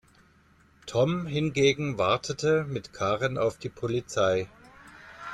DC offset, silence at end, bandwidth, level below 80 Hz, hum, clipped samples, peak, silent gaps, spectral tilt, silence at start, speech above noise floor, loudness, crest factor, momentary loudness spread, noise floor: under 0.1%; 0 s; 12.5 kHz; -58 dBFS; none; under 0.1%; -10 dBFS; none; -5 dB/octave; 0.85 s; 34 dB; -27 LUFS; 18 dB; 11 LU; -60 dBFS